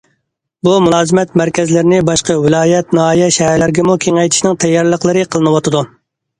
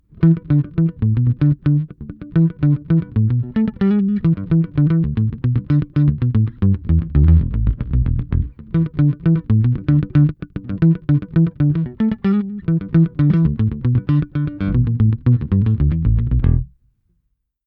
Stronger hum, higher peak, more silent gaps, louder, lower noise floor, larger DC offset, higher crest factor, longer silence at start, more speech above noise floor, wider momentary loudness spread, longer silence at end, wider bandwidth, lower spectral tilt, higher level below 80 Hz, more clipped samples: neither; about the same, 0 dBFS vs -2 dBFS; neither; first, -11 LUFS vs -17 LUFS; about the same, -68 dBFS vs -69 dBFS; neither; about the same, 12 dB vs 14 dB; first, 0.65 s vs 0.2 s; first, 57 dB vs 53 dB; second, 3 LU vs 6 LU; second, 0.55 s vs 1 s; first, 11 kHz vs 4.3 kHz; second, -5 dB/octave vs -12.5 dB/octave; second, -44 dBFS vs -28 dBFS; neither